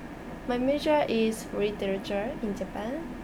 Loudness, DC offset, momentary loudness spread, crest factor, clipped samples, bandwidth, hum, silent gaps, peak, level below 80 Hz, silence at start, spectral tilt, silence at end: -29 LUFS; under 0.1%; 10 LU; 16 dB; under 0.1%; over 20 kHz; none; none; -14 dBFS; -48 dBFS; 0 s; -5.5 dB/octave; 0 s